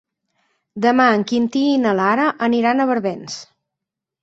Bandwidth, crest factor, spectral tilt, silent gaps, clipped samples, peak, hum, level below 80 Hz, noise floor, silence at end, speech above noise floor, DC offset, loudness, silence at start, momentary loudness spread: 8 kHz; 18 dB; -5 dB/octave; none; under 0.1%; -2 dBFS; none; -64 dBFS; -84 dBFS; 0.8 s; 67 dB; under 0.1%; -17 LUFS; 0.75 s; 15 LU